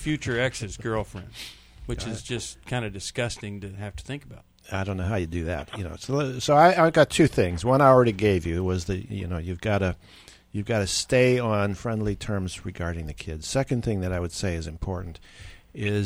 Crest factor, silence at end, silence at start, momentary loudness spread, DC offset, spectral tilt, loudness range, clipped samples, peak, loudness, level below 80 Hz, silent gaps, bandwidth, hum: 22 dB; 0 s; 0 s; 18 LU; under 0.1%; -5.5 dB/octave; 12 LU; under 0.1%; -4 dBFS; -25 LUFS; -44 dBFS; none; 15.5 kHz; none